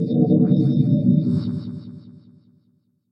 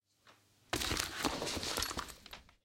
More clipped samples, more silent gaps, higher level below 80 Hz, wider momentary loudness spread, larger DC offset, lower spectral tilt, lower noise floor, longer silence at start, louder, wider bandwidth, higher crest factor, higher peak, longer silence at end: neither; neither; about the same, -56 dBFS vs -54 dBFS; first, 18 LU vs 14 LU; neither; first, -12 dB/octave vs -2 dB/octave; about the same, -64 dBFS vs -67 dBFS; second, 0 s vs 0.25 s; first, -19 LUFS vs -37 LUFS; second, 5.6 kHz vs 17 kHz; second, 16 dB vs 32 dB; first, -4 dBFS vs -8 dBFS; first, 1 s vs 0.2 s